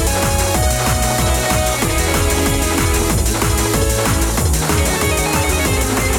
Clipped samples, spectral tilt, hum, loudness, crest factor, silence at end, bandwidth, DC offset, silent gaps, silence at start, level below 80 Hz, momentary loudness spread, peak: under 0.1%; -4 dB/octave; none; -16 LUFS; 12 dB; 0 s; 19.5 kHz; under 0.1%; none; 0 s; -22 dBFS; 1 LU; -4 dBFS